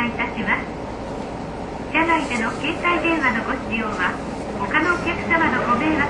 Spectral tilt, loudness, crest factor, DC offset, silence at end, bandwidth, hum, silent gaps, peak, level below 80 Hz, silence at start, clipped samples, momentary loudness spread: -5 dB/octave; -21 LUFS; 18 dB; under 0.1%; 0 s; 11 kHz; none; none; -4 dBFS; -40 dBFS; 0 s; under 0.1%; 12 LU